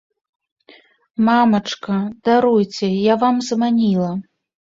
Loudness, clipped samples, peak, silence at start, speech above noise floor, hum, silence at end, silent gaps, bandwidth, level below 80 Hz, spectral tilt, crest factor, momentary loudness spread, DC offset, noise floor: -17 LUFS; under 0.1%; -2 dBFS; 1.2 s; 33 dB; none; 0.45 s; none; 7.8 kHz; -60 dBFS; -6 dB/octave; 16 dB; 8 LU; under 0.1%; -50 dBFS